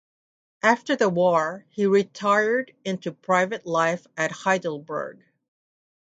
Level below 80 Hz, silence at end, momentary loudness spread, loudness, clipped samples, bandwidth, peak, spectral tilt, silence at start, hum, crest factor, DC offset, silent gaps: -74 dBFS; 0.9 s; 10 LU; -23 LUFS; under 0.1%; 9.2 kHz; -4 dBFS; -5 dB/octave; 0.65 s; none; 20 dB; under 0.1%; none